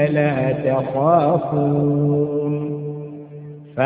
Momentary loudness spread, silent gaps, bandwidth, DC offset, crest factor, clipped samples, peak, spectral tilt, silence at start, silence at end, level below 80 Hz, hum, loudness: 17 LU; none; 3.9 kHz; under 0.1%; 18 dB; under 0.1%; -2 dBFS; -13.5 dB/octave; 0 s; 0 s; -54 dBFS; none; -19 LUFS